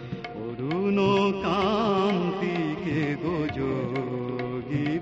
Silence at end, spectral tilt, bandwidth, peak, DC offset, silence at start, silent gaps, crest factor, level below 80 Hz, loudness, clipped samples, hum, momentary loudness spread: 0 s; -7.5 dB/octave; 7.8 kHz; -12 dBFS; under 0.1%; 0 s; none; 14 dB; -52 dBFS; -27 LUFS; under 0.1%; none; 8 LU